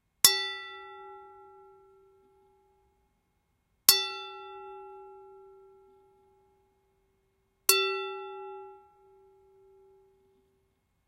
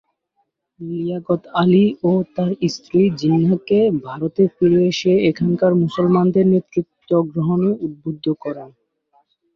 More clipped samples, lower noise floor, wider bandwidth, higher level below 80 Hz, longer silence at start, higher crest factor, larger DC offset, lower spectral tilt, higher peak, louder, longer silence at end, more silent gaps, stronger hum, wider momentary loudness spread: neither; first, -75 dBFS vs -69 dBFS; first, 15.5 kHz vs 7 kHz; second, -74 dBFS vs -56 dBFS; second, 0.25 s vs 0.8 s; first, 34 dB vs 14 dB; neither; second, 1 dB/octave vs -8 dB/octave; first, 0 dBFS vs -4 dBFS; second, -25 LUFS vs -18 LUFS; first, 2.35 s vs 0.9 s; neither; neither; first, 27 LU vs 10 LU